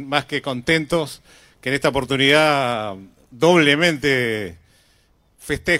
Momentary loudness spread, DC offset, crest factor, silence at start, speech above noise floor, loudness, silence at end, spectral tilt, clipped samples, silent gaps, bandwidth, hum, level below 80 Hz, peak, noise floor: 17 LU; under 0.1%; 20 dB; 0 s; 40 dB; -18 LUFS; 0 s; -4.5 dB/octave; under 0.1%; none; 16 kHz; none; -48 dBFS; 0 dBFS; -59 dBFS